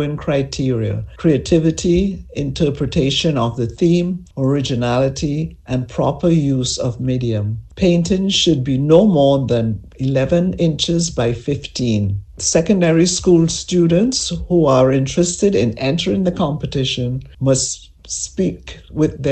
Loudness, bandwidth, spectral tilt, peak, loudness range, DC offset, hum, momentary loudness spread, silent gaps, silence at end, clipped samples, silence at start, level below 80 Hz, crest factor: -17 LUFS; 9.2 kHz; -5.5 dB/octave; 0 dBFS; 4 LU; under 0.1%; none; 9 LU; none; 0 s; under 0.1%; 0 s; -36 dBFS; 16 dB